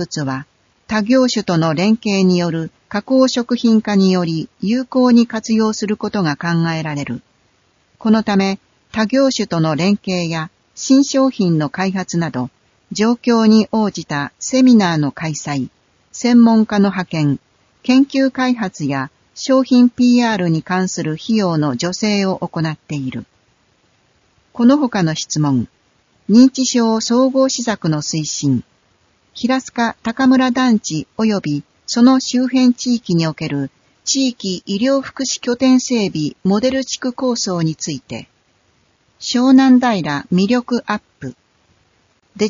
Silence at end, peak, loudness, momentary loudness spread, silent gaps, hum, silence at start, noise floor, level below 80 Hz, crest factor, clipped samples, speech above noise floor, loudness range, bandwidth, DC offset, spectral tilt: 0 s; 0 dBFS; -16 LUFS; 12 LU; none; none; 0 s; -59 dBFS; -56 dBFS; 16 dB; under 0.1%; 43 dB; 4 LU; 7.6 kHz; under 0.1%; -5.5 dB/octave